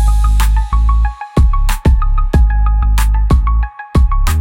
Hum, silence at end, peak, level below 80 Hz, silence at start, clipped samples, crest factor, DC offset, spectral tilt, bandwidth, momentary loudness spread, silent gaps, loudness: none; 0 s; -2 dBFS; -10 dBFS; 0 s; under 0.1%; 10 dB; under 0.1%; -6 dB/octave; 17 kHz; 3 LU; none; -14 LUFS